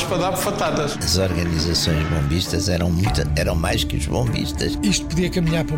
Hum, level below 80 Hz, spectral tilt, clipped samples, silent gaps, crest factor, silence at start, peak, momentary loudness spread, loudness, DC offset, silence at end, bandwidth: none; -30 dBFS; -5 dB/octave; under 0.1%; none; 12 dB; 0 s; -8 dBFS; 3 LU; -20 LUFS; under 0.1%; 0 s; 17 kHz